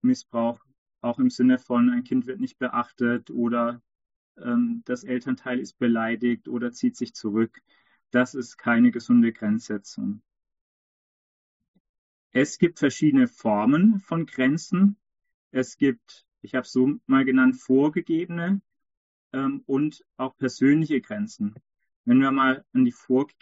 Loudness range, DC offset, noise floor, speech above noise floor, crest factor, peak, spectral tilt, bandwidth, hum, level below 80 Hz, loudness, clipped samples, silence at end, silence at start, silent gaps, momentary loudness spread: 5 LU; under 0.1%; under -90 dBFS; over 67 dB; 18 dB; -6 dBFS; -6 dB/octave; 8 kHz; none; -70 dBFS; -24 LUFS; under 0.1%; 0.15 s; 0.05 s; 0.78-0.86 s, 4.16-4.35 s, 10.61-11.60 s, 11.68-11.74 s, 11.80-12.30 s, 15.34-15.51 s, 18.97-19.31 s, 21.96-22.04 s; 12 LU